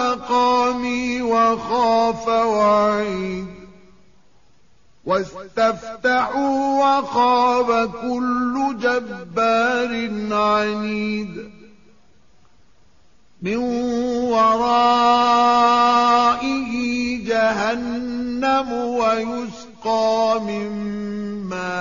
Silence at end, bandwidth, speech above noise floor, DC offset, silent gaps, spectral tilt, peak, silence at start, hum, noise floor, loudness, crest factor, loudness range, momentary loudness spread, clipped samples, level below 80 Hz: 0 s; 7.4 kHz; 39 dB; 0.3%; none; -3 dB/octave; -6 dBFS; 0 s; none; -58 dBFS; -19 LUFS; 14 dB; 8 LU; 12 LU; under 0.1%; -52 dBFS